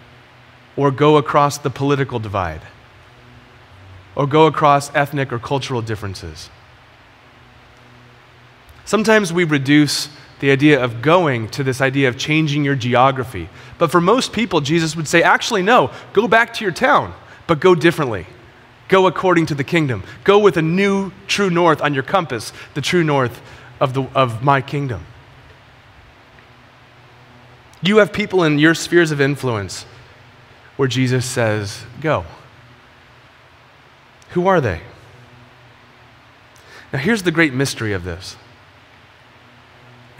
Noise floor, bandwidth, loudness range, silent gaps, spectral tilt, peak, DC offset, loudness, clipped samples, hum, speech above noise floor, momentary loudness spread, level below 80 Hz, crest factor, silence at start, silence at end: -47 dBFS; 16 kHz; 9 LU; none; -5.5 dB/octave; 0 dBFS; under 0.1%; -16 LUFS; under 0.1%; none; 31 dB; 14 LU; -50 dBFS; 18 dB; 0.75 s; 1.85 s